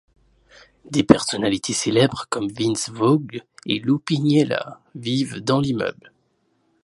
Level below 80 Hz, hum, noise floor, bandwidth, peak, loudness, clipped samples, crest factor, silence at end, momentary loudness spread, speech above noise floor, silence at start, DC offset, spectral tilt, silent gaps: -56 dBFS; none; -67 dBFS; 11.5 kHz; 0 dBFS; -21 LUFS; under 0.1%; 22 dB; 0.9 s; 10 LU; 46 dB; 0.85 s; under 0.1%; -5 dB/octave; none